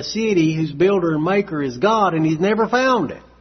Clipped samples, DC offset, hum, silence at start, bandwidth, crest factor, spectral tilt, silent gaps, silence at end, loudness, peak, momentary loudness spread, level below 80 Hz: under 0.1%; under 0.1%; none; 0 s; 6.4 kHz; 14 dB; -6 dB/octave; none; 0.2 s; -18 LUFS; -4 dBFS; 3 LU; -52 dBFS